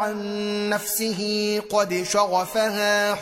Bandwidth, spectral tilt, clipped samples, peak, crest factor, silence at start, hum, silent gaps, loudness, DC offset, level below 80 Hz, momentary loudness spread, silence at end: 16.5 kHz; -3 dB/octave; under 0.1%; -8 dBFS; 16 dB; 0 s; none; none; -23 LUFS; under 0.1%; -62 dBFS; 5 LU; 0 s